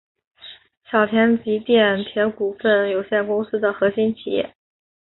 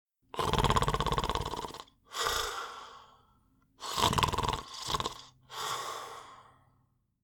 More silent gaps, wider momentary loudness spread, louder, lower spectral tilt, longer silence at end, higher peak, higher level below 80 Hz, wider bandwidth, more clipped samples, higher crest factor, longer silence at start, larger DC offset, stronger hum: first, 0.77-0.81 s vs none; second, 9 LU vs 18 LU; first, -20 LUFS vs -33 LUFS; first, -10 dB/octave vs -3.5 dB/octave; second, 0.55 s vs 0.8 s; first, -2 dBFS vs -8 dBFS; second, -62 dBFS vs -46 dBFS; second, 4.2 kHz vs over 20 kHz; neither; second, 18 dB vs 26 dB; about the same, 0.45 s vs 0.35 s; neither; neither